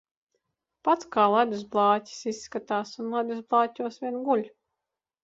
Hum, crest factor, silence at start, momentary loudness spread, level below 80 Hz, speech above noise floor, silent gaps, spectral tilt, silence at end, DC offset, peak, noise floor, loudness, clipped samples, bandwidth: none; 20 dB; 0.85 s; 11 LU; -74 dBFS; 61 dB; none; -5 dB/octave; 0.75 s; under 0.1%; -8 dBFS; -87 dBFS; -27 LUFS; under 0.1%; 8 kHz